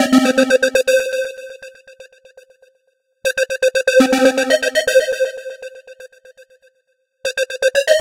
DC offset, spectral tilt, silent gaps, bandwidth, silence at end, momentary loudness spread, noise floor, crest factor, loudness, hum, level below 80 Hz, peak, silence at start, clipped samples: under 0.1%; -2 dB/octave; none; 16.5 kHz; 0 s; 19 LU; -65 dBFS; 18 dB; -16 LUFS; none; -58 dBFS; 0 dBFS; 0 s; under 0.1%